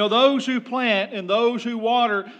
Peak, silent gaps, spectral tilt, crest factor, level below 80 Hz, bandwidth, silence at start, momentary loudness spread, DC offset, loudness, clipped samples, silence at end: -6 dBFS; none; -4.5 dB/octave; 16 dB; under -90 dBFS; 9 kHz; 0 s; 6 LU; under 0.1%; -21 LUFS; under 0.1%; 0.05 s